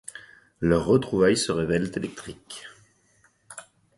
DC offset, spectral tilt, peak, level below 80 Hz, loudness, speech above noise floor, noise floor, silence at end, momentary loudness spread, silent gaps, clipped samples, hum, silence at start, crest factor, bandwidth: under 0.1%; -5.5 dB/octave; -8 dBFS; -50 dBFS; -24 LUFS; 39 dB; -63 dBFS; 0.35 s; 22 LU; none; under 0.1%; none; 0.15 s; 20 dB; 11.5 kHz